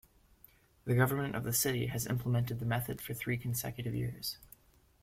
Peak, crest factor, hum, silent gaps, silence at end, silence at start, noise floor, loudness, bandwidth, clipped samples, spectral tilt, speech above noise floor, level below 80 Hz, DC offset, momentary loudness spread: -14 dBFS; 20 dB; none; none; 0.6 s; 0.85 s; -64 dBFS; -34 LUFS; 16.5 kHz; under 0.1%; -5 dB/octave; 30 dB; -60 dBFS; under 0.1%; 9 LU